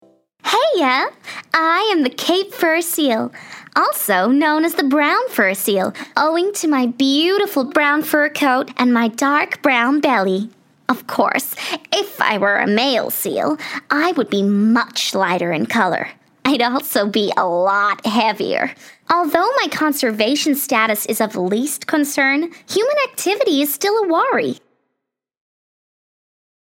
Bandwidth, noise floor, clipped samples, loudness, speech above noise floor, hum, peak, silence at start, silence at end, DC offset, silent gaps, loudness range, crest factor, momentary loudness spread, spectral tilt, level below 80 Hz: 16.5 kHz; -77 dBFS; under 0.1%; -17 LUFS; 60 dB; none; 0 dBFS; 0.45 s; 2.1 s; under 0.1%; none; 2 LU; 18 dB; 6 LU; -3.5 dB/octave; -70 dBFS